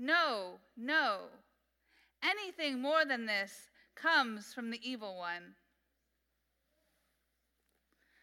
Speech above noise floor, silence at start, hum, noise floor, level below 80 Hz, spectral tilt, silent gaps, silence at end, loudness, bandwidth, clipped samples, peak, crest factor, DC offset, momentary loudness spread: 46 dB; 0 s; none; -82 dBFS; -86 dBFS; -2.5 dB/octave; none; 2.7 s; -35 LUFS; 16.5 kHz; under 0.1%; -18 dBFS; 22 dB; under 0.1%; 14 LU